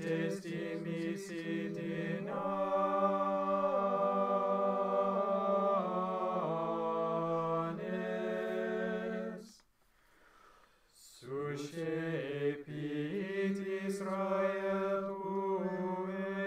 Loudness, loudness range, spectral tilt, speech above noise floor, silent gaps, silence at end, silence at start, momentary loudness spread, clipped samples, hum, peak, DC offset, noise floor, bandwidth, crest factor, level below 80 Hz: -35 LUFS; 9 LU; -7 dB/octave; 33 dB; none; 0 s; 0 s; 8 LU; under 0.1%; none; -20 dBFS; under 0.1%; -70 dBFS; 14.5 kHz; 16 dB; -76 dBFS